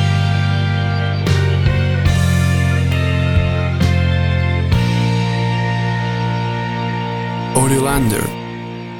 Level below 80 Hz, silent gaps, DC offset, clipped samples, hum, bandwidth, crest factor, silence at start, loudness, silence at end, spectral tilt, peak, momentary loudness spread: -30 dBFS; none; under 0.1%; under 0.1%; none; 16.5 kHz; 16 dB; 0 s; -16 LUFS; 0 s; -6 dB/octave; 0 dBFS; 6 LU